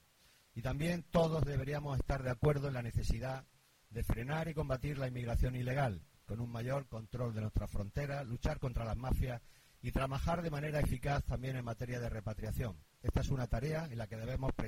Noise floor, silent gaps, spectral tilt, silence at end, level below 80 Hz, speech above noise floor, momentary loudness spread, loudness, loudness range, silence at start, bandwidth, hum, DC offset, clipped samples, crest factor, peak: -68 dBFS; none; -7 dB/octave; 0 s; -44 dBFS; 31 dB; 9 LU; -39 LUFS; 3 LU; 0.55 s; 16.5 kHz; none; under 0.1%; under 0.1%; 18 dB; -20 dBFS